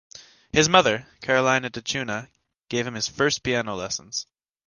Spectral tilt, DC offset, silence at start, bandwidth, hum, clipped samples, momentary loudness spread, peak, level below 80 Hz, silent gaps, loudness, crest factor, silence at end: -3 dB/octave; under 0.1%; 0.15 s; 10.5 kHz; none; under 0.1%; 14 LU; -2 dBFS; -54 dBFS; none; -23 LUFS; 22 dB; 0.45 s